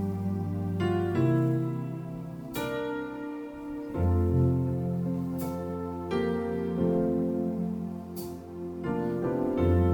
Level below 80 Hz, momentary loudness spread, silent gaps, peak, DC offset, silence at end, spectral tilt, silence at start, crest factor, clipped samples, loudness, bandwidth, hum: -52 dBFS; 12 LU; none; -14 dBFS; under 0.1%; 0 s; -8.5 dB/octave; 0 s; 14 dB; under 0.1%; -30 LUFS; over 20 kHz; none